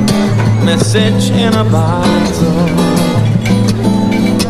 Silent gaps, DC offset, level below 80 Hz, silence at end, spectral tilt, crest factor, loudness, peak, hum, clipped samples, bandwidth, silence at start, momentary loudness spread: none; 2%; -32 dBFS; 0 s; -6 dB/octave; 10 dB; -11 LUFS; -2 dBFS; none; under 0.1%; 14 kHz; 0 s; 1 LU